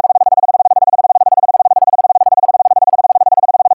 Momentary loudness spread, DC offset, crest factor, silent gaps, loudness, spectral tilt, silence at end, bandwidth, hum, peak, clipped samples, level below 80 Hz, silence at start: 0 LU; under 0.1%; 8 dB; none; -10 LUFS; -8 dB/octave; 0 s; 1.6 kHz; none; -2 dBFS; under 0.1%; -66 dBFS; 0.05 s